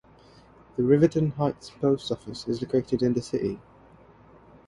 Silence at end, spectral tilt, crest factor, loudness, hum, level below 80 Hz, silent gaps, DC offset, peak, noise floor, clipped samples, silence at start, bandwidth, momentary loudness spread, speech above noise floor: 1.1 s; -7.5 dB/octave; 20 dB; -26 LUFS; none; -56 dBFS; none; under 0.1%; -8 dBFS; -54 dBFS; under 0.1%; 0.75 s; 11.5 kHz; 12 LU; 29 dB